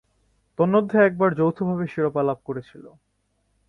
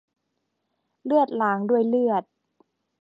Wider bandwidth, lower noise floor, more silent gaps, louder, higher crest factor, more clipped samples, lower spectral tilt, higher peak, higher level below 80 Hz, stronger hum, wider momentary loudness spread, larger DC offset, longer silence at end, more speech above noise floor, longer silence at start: first, 5.8 kHz vs 5.2 kHz; second, -70 dBFS vs -77 dBFS; neither; about the same, -22 LUFS vs -23 LUFS; about the same, 18 dB vs 16 dB; neither; about the same, -10 dB/octave vs -9 dB/octave; first, -6 dBFS vs -10 dBFS; first, -62 dBFS vs -80 dBFS; neither; first, 15 LU vs 6 LU; neither; about the same, 0.8 s vs 0.8 s; second, 48 dB vs 56 dB; second, 0.6 s vs 1.05 s